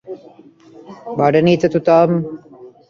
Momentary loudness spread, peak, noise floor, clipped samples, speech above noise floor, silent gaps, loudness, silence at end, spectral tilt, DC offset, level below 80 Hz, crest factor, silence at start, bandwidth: 22 LU; -2 dBFS; -44 dBFS; under 0.1%; 30 dB; none; -15 LUFS; 0.2 s; -8 dB/octave; under 0.1%; -56 dBFS; 16 dB; 0.05 s; 7 kHz